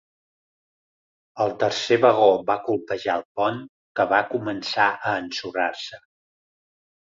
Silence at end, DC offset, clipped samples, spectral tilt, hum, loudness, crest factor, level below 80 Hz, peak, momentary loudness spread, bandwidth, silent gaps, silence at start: 1.15 s; under 0.1%; under 0.1%; -4.5 dB/octave; none; -22 LUFS; 20 dB; -66 dBFS; -4 dBFS; 10 LU; 7.6 kHz; 3.25-3.35 s, 3.69-3.95 s; 1.35 s